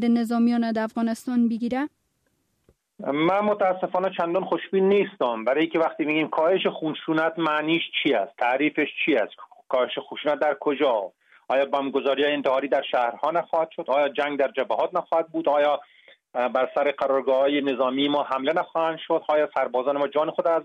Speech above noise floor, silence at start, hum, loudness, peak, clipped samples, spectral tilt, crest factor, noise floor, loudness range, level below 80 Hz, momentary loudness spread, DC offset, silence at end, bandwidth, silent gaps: 48 dB; 0 s; none; -24 LUFS; -10 dBFS; under 0.1%; -6 dB/octave; 14 dB; -71 dBFS; 2 LU; -72 dBFS; 5 LU; under 0.1%; 0 s; 13.5 kHz; none